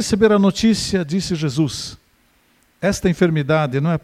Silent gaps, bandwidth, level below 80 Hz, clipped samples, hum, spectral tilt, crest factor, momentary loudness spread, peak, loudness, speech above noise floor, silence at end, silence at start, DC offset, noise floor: none; 15 kHz; -44 dBFS; under 0.1%; none; -5.5 dB/octave; 18 dB; 8 LU; -2 dBFS; -18 LUFS; 41 dB; 0.05 s; 0 s; under 0.1%; -58 dBFS